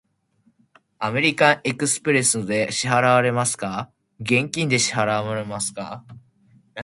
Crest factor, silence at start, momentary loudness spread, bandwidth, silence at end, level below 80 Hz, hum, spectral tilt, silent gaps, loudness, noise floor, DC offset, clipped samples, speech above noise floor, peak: 22 dB; 1 s; 16 LU; 11.5 kHz; 0 s; -60 dBFS; none; -3.5 dB/octave; none; -20 LUFS; -64 dBFS; under 0.1%; under 0.1%; 43 dB; 0 dBFS